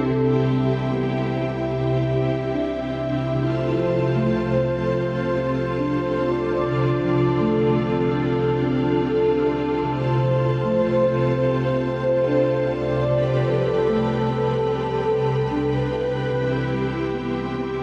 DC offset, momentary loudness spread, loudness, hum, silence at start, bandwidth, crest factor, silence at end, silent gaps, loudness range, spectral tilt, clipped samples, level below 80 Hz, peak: under 0.1%; 4 LU; -22 LUFS; none; 0 s; 6.8 kHz; 12 dB; 0 s; none; 2 LU; -9 dB/octave; under 0.1%; -42 dBFS; -8 dBFS